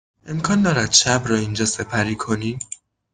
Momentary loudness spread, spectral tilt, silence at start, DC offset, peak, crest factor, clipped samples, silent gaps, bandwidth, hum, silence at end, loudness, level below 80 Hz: 16 LU; -3.5 dB/octave; 0.25 s; under 0.1%; 0 dBFS; 20 dB; under 0.1%; none; 10 kHz; none; 0.4 s; -19 LUFS; -48 dBFS